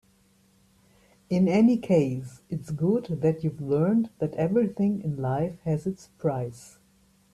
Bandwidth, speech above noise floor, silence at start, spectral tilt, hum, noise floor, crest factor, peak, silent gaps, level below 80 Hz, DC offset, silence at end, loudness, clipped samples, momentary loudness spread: 12.5 kHz; 37 dB; 1.3 s; -8.5 dB/octave; none; -63 dBFS; 16 dB; -10 dBFS; none; -60 dBFS; under 0.1%; 0.65 s; -26 LUFS; under 0.1%; 13 LU